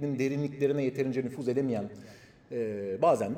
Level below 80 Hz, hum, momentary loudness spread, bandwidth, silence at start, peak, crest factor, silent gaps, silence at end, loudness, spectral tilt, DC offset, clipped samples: -70 dBFS; none; 10 LU; 15 kHz; 0 s; -12 dBFS; 18 dB; none; 0 s; -31 LUFS; -7.5 dB/octave; under 0.1%; under 0.1%